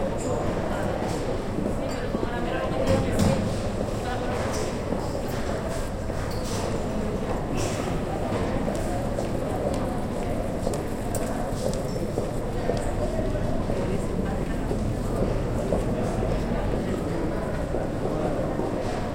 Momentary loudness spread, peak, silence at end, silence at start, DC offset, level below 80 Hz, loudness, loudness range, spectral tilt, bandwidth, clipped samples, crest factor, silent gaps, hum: 3 LU; -10 dBFS; 0 s; 0 s; under 0.1%; -34 dBFS; -28 LUFS; 2 LU; -6.5 dB/octave; 16.5 kHz; under 0.1%; 16 dB; none; none